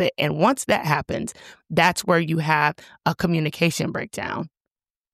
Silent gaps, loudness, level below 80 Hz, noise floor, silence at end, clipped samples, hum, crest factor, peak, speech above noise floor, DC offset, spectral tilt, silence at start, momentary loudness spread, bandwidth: none; -22 LUFS; -54 dBFS; -88 dBFS; 0.65 s; under 0.1%; none; 18 dB; -4 dBFS; 66 dB; under 0.1%; -5 dB/octave; 0 s; 10 LU; 15 kHz